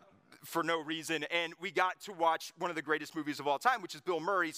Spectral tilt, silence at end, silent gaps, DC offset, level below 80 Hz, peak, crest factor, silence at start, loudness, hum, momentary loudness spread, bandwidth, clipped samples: -3 dB/octave; 0 s; none; under 0.1%; under -90 dBFS; -14 dBFS; 22 dB; 0.3 s; -34 LUFS; none; 6 LU; 15.5 kHz; under 0.1%